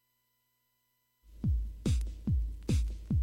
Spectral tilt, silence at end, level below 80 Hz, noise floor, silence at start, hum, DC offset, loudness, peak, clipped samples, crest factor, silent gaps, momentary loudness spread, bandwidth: -7 dB/octave; 0 s; -36 dBFS; -78 dBFS; 1.3 s; 60 Hz at -50 dBFS; under 0.1%; -34 LUFS; -20 dBFS; under 0.1%; 14 dB; none; 1 LU; 13 kHz